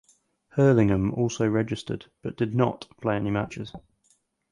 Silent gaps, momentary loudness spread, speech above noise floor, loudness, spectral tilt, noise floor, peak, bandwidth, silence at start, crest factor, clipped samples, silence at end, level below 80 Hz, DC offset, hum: none; 14 LU; 43 dB; -25 LUFS; -7 dB/octave; -68 dBFS; -8 dBFS; 11 kHz; 0.55 s; 18 dB; under 0.1%; 0.75 s; -50 dBFS; under 0.1%; none